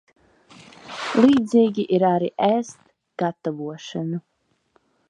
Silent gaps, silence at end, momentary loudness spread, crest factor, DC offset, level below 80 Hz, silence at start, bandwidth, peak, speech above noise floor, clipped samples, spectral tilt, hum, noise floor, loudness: none; 0.9 s; 16 LU; 20 dB; under 0.1%; -66 dBFS; 0.85 s; 10 kHz; -2 dBFS; 44 dB; under 0.1%; -6.5 dB/octave; none; -65 dBFS; -21 LUFS